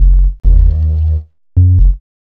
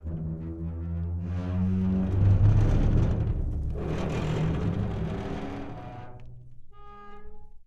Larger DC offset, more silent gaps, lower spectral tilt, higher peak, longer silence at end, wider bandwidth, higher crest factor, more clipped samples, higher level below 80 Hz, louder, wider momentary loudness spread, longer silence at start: neither; neither; first, -11.5 dB/octave vs -9 dB/octave; first, 0 dBFS vs -10 dBFS; first, 0.25 s vs 0.05 s; second, 0.8 kHz vs 7.6 kHz; second, 8 dB vs 16 dB; first, 0.4% vs under 0.1%; first, -10 dBFS vs -34 dBFS; first, -13 LUFS vs -28 LUFS; second, 7 LU vs 21 LU; about the same, 0 s vs 0 s